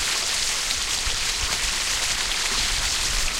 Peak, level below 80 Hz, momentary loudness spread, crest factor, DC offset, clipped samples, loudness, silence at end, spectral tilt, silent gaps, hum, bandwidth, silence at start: -8 dBFS; -34 dBFS; 1 LU; 16 dB; under 0.1%; under 0.1%; -22 LUFS; 0 s; 0.5 dB/octave; none; none; 16 kHz; 0 s